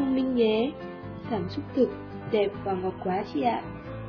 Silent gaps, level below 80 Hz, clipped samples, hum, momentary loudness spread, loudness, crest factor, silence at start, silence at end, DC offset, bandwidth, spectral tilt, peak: none; -54 dBFS; under 0.1%; none; 14 LU; -28 LUFS; 16 dB; 0 s; 0 s; under 0.1%; 5.4 kHz; -8.5 dB/octave; -12 dBFS